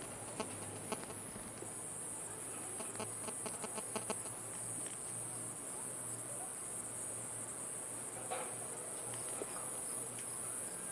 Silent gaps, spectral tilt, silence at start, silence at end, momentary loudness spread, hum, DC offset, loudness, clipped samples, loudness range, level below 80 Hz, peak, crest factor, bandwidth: none; -2.5 dB/octave; 0 s; 0 s; 3 LU; none; under 0.1%; -41 LUFS; under 0.1%; 1 LU; -74 dBFS; -24 dBFS; 20 dB; 11.5 kHz